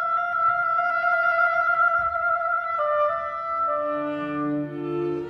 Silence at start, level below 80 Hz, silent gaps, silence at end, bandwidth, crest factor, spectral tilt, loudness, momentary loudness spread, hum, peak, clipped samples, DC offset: 0 s; -60 dBFS; none; 0 s; 6 kHz; 14 dB; -7.5 dB/octave; -23 LUFS; 8 LU; none; -10 dBFS; under 0.1%; under 0.1%